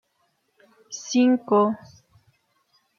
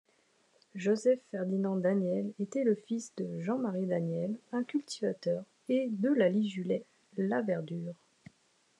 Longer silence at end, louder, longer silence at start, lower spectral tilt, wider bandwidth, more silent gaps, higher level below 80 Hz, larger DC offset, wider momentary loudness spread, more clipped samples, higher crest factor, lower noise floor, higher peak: first, 1.25 s vs 0.85 s; first, -21 LUFS vs -33 LUFS; first, 0.9 s vs 0.75 s; second, -5 dB/octave vs -7 dB/octave; second, 7.2 kHz vs 10.5 kHz; neither; first, -74 dBFS vs -88 dBFS; neither; first, 17 LU vs 9 LU; neither; about the same, 18 dB vs 16 dB; about the same, -70 dBFS vs -70 dBFS; first, -8 dBFS vs -16 dBFS